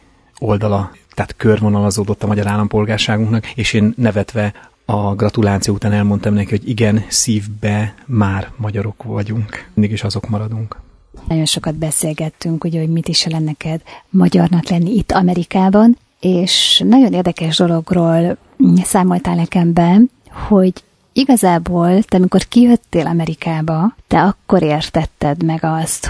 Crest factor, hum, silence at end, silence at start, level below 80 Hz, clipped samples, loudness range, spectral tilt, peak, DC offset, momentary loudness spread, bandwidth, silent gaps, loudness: 14 dB; none; 0 s; 0.4 s; -40 dBFS; under 0.1%; 7 LU; -5.5 dB/octave; 0 dBFS; under 0.1%; 10 LU; 11 kHz; none; -15 LUFS